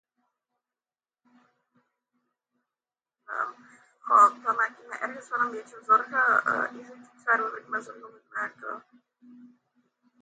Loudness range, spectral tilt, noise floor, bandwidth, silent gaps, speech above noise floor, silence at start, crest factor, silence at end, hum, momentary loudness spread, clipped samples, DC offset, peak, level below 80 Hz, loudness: 17 LU; -3.5 dB/octave; under -90 dBFS; 9 kHz; none; over 63 dB; 3.3 s; 22 dB; 0.75 s; none; 19 LU; under 0.1%; under 0.1%; -8 dBFS; under -90 dBFS; -26 LUFS